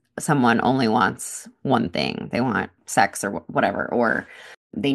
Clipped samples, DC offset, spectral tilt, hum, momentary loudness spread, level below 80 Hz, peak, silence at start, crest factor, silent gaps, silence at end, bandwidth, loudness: under 0.1%; under 0.1%; -4.5 dB/octave; none; 11 LU; -58 dBFS; -2 dBFS; 0.15 s; 20 dB; 4.57-4.70 s; 0 s; 12.5 kHz; -22 LUFS